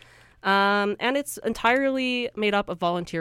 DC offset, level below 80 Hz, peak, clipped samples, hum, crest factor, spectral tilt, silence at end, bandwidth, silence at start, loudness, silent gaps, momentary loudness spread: under 0.1%; -56 dBFS; -6 dBFS; under 0.1%; none; 18 dB; -4 dB/octave; 0 s; 16.5 kHz; 0.45 s; -24 LUFS; none; 6 LU